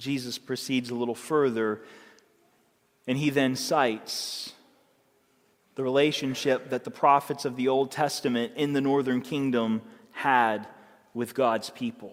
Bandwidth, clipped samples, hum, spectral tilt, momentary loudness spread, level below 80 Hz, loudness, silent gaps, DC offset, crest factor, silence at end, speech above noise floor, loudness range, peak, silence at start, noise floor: 16.5 kHz; under 0.1%; none; -4.5 dB/octave; 11 LU; -74 dBFS; -27 LUFS; none; under 0.1%; 20 dB; 0 s; 40 dB; 4 LU; -6 dBFS; 0 s; -67 dBFS